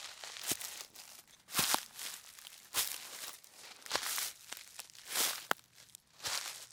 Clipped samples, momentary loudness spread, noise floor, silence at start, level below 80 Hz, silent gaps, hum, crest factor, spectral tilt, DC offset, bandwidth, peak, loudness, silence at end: under 0.1%; 18 LU; -60 dBFS; 0 s; -78 dBFS; none; none; 32 dB; 0.5 dB/octave; under 0.1%; 18 kHz; -10 dBFS; -37 LUFS; 0 s